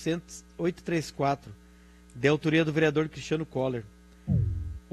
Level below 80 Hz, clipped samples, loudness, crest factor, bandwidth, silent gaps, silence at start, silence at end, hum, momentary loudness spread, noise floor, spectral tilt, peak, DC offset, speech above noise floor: -46 dBFS; under 0.1%; -29 LUFS; 20 dB; 12.5 kHz; none; 0 s; 0.15 s; none; 11 LU; -54 dBFS; -6.5 dB/octave; -10 dBFS; under 0.1%; 26 dB